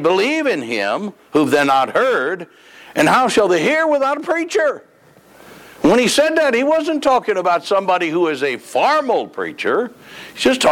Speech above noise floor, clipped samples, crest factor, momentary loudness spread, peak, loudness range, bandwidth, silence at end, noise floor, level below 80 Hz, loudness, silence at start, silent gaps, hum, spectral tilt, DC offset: 31 dB; under 0.1%; 12 dB; 9 LU; -6 dBFS; 2 LU; 17.5 kHz; 0 s; -48 dBFS; -56 dBFS; -16 LUFS; 0 s; none; none; -4 dB/octave; under 0.1%